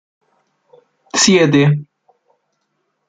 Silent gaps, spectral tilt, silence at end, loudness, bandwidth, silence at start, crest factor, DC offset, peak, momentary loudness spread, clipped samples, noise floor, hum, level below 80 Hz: none; -4.5 dB/octave; 1.25 s; -13 LUFS; 9.6 kHz; 1.15 s; 16 dB; under 0.1%; -2 dBFS; 10 LU; under 0.1%; -69 dBFS; none; -58 dBFS